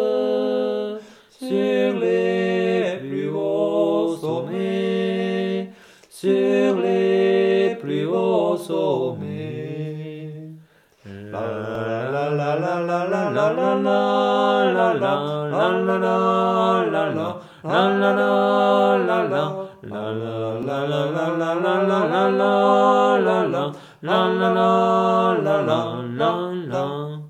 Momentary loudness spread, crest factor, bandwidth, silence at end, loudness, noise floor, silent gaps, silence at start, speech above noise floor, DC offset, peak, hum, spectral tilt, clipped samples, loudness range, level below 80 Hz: 12 LU; 18 dB; 13.5 kHz; 0 s; -20 LUFS; -50 dBFS; none; 0 s; 31 dB; under 0.1%; -4 dBFS; none; -7 dB/octave; under 0.1%; 6 LU; -70 dBFS